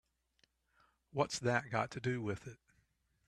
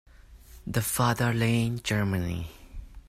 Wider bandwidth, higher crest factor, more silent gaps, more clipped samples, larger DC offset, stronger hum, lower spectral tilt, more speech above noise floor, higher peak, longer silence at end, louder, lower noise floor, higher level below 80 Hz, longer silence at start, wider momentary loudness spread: second, 12.5 kHz vs 16 kHz; first, 24 dB vs 18 dB; neither; neither; neither; neither; about the same, -5 dB/octave vs -5 dB/octave; first, 40 dB vs 23 dB; second, -18 dBFS vs -10 dBFS; first, 0.7 s vs 0.1 s; second, -38 LUFS vs -27 LUFS; first, -77 dBFS vs -50 dBFS; second, -72 dBFS vs -46 dBFS; first, 1.15 s vs 0.2 s; second, 11 LU vs 18 LU